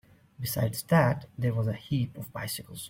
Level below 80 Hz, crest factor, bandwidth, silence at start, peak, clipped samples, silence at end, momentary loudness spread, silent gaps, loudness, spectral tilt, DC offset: -58 dBFS; 18 dB; 16.5 kHz; 0.4 s; -12 dBFS; under 0.1%; 0 s; 11 LU; none; -29 LUFS; -6 dB/octave; under 0.1%